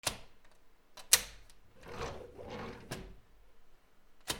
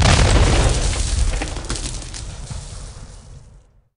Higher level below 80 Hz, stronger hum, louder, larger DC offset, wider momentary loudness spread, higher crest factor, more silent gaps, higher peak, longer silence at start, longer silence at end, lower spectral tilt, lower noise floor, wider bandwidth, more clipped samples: second, -58 dBFS vs -22 dBFS; neither; second, -34 LUFS vs -19 LUFS; neither; first, 28 LU vs 21 LU; first, 34 dB vs 18 dB; neither; second, -6 dBFS vs 0 dBFS; about the same, 0.05 s vs 0 s; second, 0 s vs 0.4 s; second, -0.5 dB/octave vs -4 dB/octave; first, -58 dBFS vs -48 dBFS; first, over 20 kHz vs 11 kHz; neither